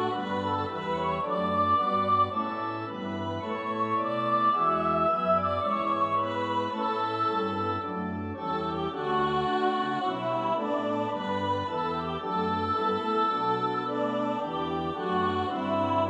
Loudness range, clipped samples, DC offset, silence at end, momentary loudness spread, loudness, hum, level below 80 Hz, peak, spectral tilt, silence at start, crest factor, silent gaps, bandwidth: 3 LU; under 0.1%; under 0.1%; 0 s; 7 LU; -28 LUFS; none; -60 dBFS; -14 dBFS; -7 dB/octave; 0 s; 14 dB; none; 9 kHz